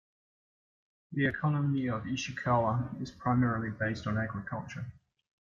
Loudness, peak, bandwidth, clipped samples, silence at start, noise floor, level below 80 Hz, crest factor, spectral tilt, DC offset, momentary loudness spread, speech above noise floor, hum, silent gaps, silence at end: -32 LUFS; -16 dBFS; 7.4 kHz; under 0.1%; 1.1 s; under -90 dBFS; -60 dBFS; 18 dB; -7 dB/octave; under 0.1%; 11 LU; over 59 dB; none; none; 0.65 s